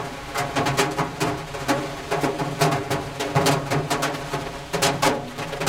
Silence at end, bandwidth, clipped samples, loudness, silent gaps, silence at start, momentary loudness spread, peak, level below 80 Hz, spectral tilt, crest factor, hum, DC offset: 0 s; 17 kHz; under 0.1%; -24 LUFS; none; 0 s; 8 LU; -6 dBFS; -46 dBFS; -4 dB/octave; 18 dB; none; under 0.1%